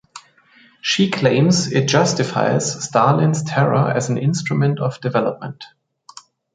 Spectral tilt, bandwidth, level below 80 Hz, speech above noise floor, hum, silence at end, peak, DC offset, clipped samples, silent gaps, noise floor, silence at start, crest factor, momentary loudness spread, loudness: -5 dB/octave; 9.4 kHz; -58 dBFS; 34 dB; none; 0.9 s; -2 dBFS; under 0.1%; under 0.1%; none; -52 dBFS; 0.15 s; 16 dB; 7 LU; -18 LUFS